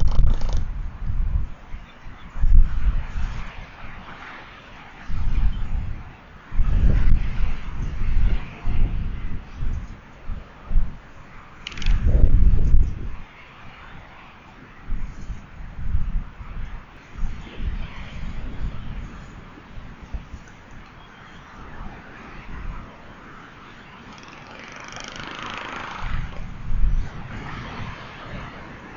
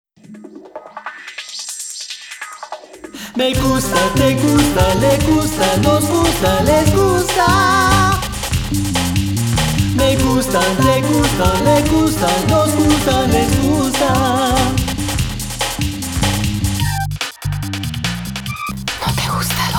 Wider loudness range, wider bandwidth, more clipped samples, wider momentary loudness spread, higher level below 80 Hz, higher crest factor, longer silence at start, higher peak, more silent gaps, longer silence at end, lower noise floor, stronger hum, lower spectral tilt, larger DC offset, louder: first, 14 LU vs 7 LU; second, 6.6 kHz vs 19.5 kHz; neither; first, 20 LU vs 14 LU; about the same, -24 dBFS vs -28 dBFS; first, 22 dB vs 16 dB; second, 0 s vs 0.3 s; about the same, 0 dBFS vs 0 dBFS; neither; about the same, 0 s vs 0 s; first, -44 dBFS vs -37 dBFS; neither; first, -6.5 dB/octave vs -4.5 dB/octave; neither; second, -29 LUFS vs -15 LUFS